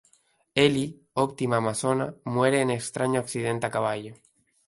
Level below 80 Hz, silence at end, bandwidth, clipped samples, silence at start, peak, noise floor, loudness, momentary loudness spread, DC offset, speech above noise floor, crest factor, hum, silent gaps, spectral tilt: -62 dBFS; 0.55 s; 11.5 kHz; under 0.1%; 0.55 s; -6 dBFS; -65 dBFS; -26 LUFS; 7 LU; under 0.1%; 40 dB; 20 dB; none; none; -5 dB/octave